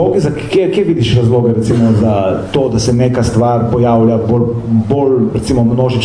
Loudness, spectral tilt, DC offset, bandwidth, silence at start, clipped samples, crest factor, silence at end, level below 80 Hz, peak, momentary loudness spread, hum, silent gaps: -12 LUFS; -7.5 dB/octave; under 0.1%; 10.5 kHz; 0 s; under 0.1%; 10 dB; 0 s; -34 dBFS; 0 dBFS; 3 LU; none; none